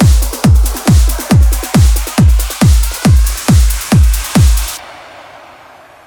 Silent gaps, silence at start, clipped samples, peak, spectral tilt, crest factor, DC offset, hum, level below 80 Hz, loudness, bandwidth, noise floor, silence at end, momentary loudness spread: none; 0 s; under 0.1%; 0 dBFS; -5.5 dB/octave; 10 dB; under 0.1%; none; -12 dBFS; -11 LUFS; over 20 kHz; -38 dBFS; 0.85 s; 1 LU